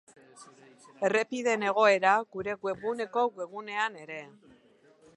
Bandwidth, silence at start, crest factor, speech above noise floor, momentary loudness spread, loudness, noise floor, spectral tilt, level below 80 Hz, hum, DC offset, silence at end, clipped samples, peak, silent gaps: 11 kHz; 0.35 s; 20 dB; 32 dB; 15 LU; -28 LUFS; -61 dBFS; -3.5 dB/octave; -74 dBFS; none; under 0.1%; 0.9 s; under 0.1%; -10 dBFS; none